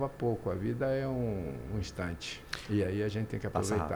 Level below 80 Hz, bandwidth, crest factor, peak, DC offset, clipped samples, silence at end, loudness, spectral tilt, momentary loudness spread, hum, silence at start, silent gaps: -50 dBFS; over 20 kHz; 18 dB; -16 dBFS; under 0.1%; under 0.1%; 0 s; -34 LUFS; -6 dB/octave; 6 LU; none; 0 s; none